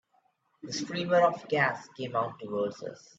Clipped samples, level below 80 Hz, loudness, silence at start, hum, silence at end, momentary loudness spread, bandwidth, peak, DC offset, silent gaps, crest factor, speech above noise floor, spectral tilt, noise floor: under 0.1%; -74 dBFS; -30 LUFS; 0.65 s; none; 0.2 s; 13 LU; 8 kHz; -10 dBFS; under 0.1%; none; 20 dB; 41 dB; -4.5 dB/octave; -71 dBFS